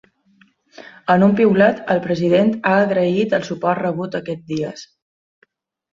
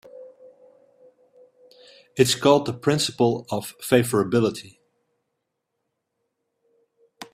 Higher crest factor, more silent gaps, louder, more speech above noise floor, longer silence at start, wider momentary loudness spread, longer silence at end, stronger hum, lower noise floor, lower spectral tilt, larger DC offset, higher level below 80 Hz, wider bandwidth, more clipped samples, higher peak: second, 18 dB vs 24 dB; neither; first, -17 LUFS vs -21 LUFS; second, 45 dB vs 58 dB; first, 0.8 s vs 0.15 s; about the same, 12 LU vs 13 LU; first, 1.1 s vs 0.1 s; neither; second, -62 dBFS vs -79 dBFS; first, -7.5 dB/octave vs -4.5 dB/octave; neither; about the same, -60 dBFS vs -62 dBFS; second, 7.4 kHz vs 15.5 kHz; neither; about the same, -2 dBFS vs -2 dBFS